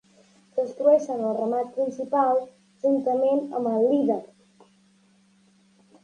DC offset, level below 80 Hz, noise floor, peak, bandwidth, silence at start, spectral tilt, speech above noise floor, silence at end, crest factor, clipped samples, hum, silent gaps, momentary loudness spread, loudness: under 0.1%; -78 dBFS; -60 dBFS; -8 dBFS; 9.6 kHz; 0.55 s; -7.5 dB/octave; 37 dB; 1.75 s; 16 dB; under 0.1%; none; none; 9 LU; -24 LUFS